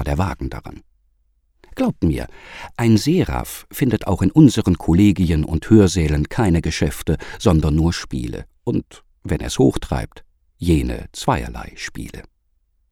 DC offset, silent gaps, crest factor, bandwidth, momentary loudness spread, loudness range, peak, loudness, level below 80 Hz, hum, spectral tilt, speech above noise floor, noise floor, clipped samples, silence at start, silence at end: under 0.1%; none; 18 dB; 17.5 kHz; 17 LU; 6 LU; 0 dBFS; -19 LUFS; -30 dBFS; none; -6.5 dB/octave; 46 dB; -64 dBFS; under 0.1%; 0 s; 0.7 s